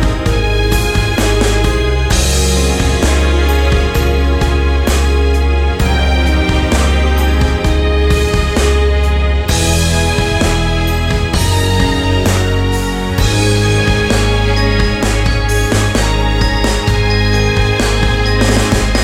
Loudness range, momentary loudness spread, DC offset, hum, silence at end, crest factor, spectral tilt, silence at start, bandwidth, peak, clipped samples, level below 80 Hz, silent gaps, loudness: 1 LU; 2 LU; under 0.1%; none; 0 s; 12 dB; -5 dB/octave; 0 s; 16.5 kHz; 0 dBFS; under 0.1%; -14 dBFS; none; -13 LUFS